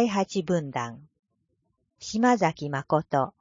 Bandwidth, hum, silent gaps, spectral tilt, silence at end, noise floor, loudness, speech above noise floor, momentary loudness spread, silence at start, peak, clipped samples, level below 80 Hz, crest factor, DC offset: 7.6 kHz; none; 1.19-1.23 s; -6 dB/octave; 0.1 s; -75 dBFS; -26 LUFS; 49 dB; 11 LU; 0 s; -8 dBFS; under 0.1%; -64 dBFS; 18 dB; under 0.1%